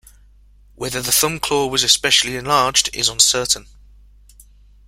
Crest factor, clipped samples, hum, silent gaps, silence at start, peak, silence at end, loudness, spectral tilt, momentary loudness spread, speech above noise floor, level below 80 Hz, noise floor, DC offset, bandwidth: 20 dB; under 0.1%; none; none; 0.8 s; 0 dBFS; 1.25 s; -15 LUFS; -1 dB/octave; 8 LU; 31 dB; -46 dBFS; -49 dBFS; under 0.1%; 16.5 kHz